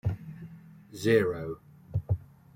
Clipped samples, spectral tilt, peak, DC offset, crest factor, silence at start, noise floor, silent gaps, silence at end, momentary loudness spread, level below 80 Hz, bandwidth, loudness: under 0.1%; -7 dB/octave; -10 dBFS; under 0.1%; 20 dB; 0.05 s; -48 dBFS; none; 0.35 s; 23 LU; -54 dBFS; 16.5 kHz; -30 LUFS